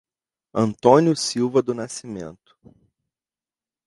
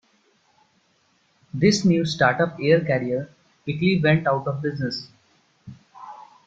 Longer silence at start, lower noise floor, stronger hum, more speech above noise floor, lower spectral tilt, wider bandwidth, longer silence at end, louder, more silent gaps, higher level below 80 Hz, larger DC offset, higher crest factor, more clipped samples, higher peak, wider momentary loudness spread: second, 0.55 s vs 1.55 s; first, under -90 dBFS vs -64 dBFS; neither; first, over 69 dB vs 43 dB; about the same, -5.5 dB/octave vs -6 dB/octave; first, 11.5 kHz vs 7.8 kHz; first, 1.55 s vs 0.25 s; about the same, -20 LUFS vs -22 LUFS; neither; about the same, -62 dBFS vs -58 dBFS; neither; about the same, 22 dB vs 20 dB; neither; first, 0 dBFS vs -4 dBFS; about the same, 19 LU vs 21 LU